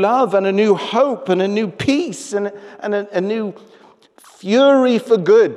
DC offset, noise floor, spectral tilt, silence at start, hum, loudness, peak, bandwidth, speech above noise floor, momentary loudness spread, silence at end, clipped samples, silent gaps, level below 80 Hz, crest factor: under 0.1%; -48 dBFS; -5.5 dB/octave; 0 s; none; -16 LUFS; -4 dBFS; 12 kHz; 32 dB; 11 LU; 0 s; under 0.1%; none; -60 dBFS; 12 dB